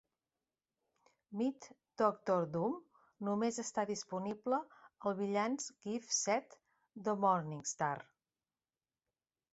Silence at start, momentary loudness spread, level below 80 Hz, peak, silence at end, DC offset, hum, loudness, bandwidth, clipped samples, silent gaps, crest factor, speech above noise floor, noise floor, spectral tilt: 1.3 s; 10 LU; -82 dBFS; -18 dBFS; 1.5 s; under 0.1%; none; -38 LUFS; 8 kHz; under 0.1%; none; 22 dB; over 53 dB; under -90 dBFS; -5 dB/octave